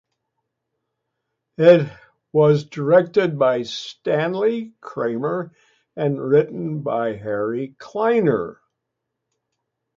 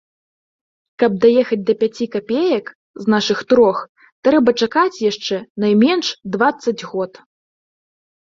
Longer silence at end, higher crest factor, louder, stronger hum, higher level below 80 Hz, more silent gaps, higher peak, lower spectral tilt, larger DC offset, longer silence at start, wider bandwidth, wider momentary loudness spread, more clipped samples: first, 1.45 s vs 1.2 s; about the same, 20 dB vs 16 dB; second, -20 LUFS vs -17 LUFS; neither; about the same, -64 dBFS vs -60 dBFS; second, none vs 2.75-2.94 s, 3.89-3.95 s, 4.12-4.23 s, 5.50-5.55 s; about the same, 0 dBFS vs -2 dBFS; first, -7.5 dB/octave vs -5 dB/octave; neither; first, 1.6 s vs 1 s; about the same, 7.4 kHz vs 7.6 kHz; first, 13 LU vs 10 LU; neither